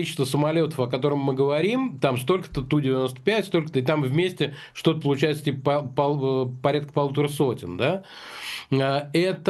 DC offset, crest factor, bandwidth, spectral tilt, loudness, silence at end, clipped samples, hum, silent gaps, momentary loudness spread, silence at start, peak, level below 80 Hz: under 0.1%; 18 dB; 12.5 kHz; -6.5 dB/octave; -24 LUFS; 0 s; under 0.1%; none; none; 3 LU; 0 s; -6 dBFS; -56 dBFS